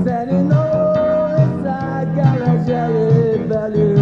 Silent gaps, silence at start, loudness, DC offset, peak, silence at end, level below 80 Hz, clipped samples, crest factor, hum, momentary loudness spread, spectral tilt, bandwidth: none; 0 s; -16 LUFS; under 0.1%; -2 dBFS; 0 s; -44 dBFS; under 0.1%; 14 dB; none; 5 LU; -10 dB/octave; 6.6 kHz